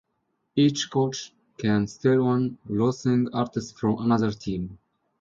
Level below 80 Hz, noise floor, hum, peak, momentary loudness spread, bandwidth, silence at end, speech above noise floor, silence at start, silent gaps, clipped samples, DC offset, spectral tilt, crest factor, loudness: -56 dBFS; -75 dBFS; none; -8 dBFS; 9 LU; 7.6 kHz; 0.45 s; 51 dB; 0.55 s; none; under 0.1%; under 0.1%; -6.5 dB/octave; 16 dB; -25 LUFS